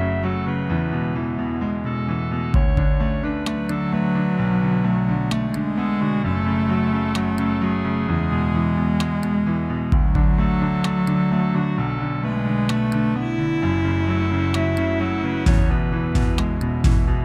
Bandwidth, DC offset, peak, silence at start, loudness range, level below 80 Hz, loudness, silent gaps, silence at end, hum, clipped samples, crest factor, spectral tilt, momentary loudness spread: 11.5 kHz; under 0.1%; -6 dBFS; 0 s; 2 LU; -26 dBFS; -21 LUFS; none; 0 s; none; under 0.1%; 14 dB; -7.5 dB/octave; 5 LU